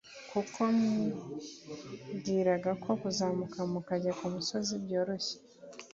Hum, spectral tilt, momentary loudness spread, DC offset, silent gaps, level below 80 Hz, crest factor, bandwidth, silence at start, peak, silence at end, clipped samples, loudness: none; -5 dB/octave; 16 LU; under 0.1%; none; -70 dBFS; 18 dB; 7.8 kHz; 0.05 s; -16 dBFS; 0.05 s; under 0.1%; -33 LUFS